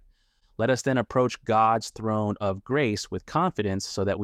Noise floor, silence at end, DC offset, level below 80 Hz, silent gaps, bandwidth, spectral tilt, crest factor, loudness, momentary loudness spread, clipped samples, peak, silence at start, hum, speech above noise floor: -63 dBFS; 0 s; under 0.1%; -56 dBFS; none; 15 kHz; -5.5 dB/octave; 16 dB; -26 LUFS; 7 LU; under 0.1%; -10 dBFS; 0.6 s; none; 38 dB